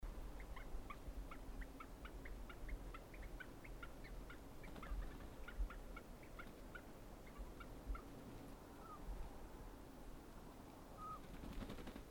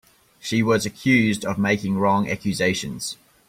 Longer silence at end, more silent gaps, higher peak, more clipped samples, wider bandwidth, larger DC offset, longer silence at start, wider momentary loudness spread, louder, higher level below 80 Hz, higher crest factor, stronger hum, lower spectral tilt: second, 0 s vs 0.35 s; neither; second, -34 dBFS vs -6 dBFS; neither; first, 19.5 kHz vs 16 kHz; neither; second, 0 s vs 0.45 s; second, 6 LU vs 11 LU; second, -56 LUFS vs -22 LUFS; about the same, -54 dBFS vs -54 dBFS; about the same, 18 dB vs 16 dB; neither; about the same, -5.5 dB/octave vs -5 dB/octave